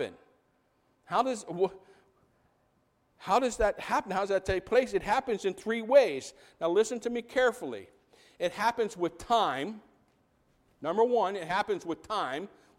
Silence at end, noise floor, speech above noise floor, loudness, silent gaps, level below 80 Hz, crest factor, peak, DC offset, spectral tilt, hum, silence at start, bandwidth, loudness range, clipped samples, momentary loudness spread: 0.3 s; -71 dBFS; 42 dB; -30 LUFS; none; -56 dBFS; 20 dB; -10 dBFS; under 0.1%; -4 dB/octave; none; 0 s; 15.5 kHz; 5 LU; under 0.1%; 13 LU